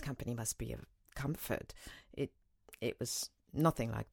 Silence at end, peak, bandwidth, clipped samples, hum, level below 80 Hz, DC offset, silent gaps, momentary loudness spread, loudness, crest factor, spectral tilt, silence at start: 0.05 s; -16 dBFS; 19 kHz; under 0.1%; none; -56 dBFS; under 0.1%; none; 17 LU; -39 LUFS; 24 dB; -5 dB/octave; 0 s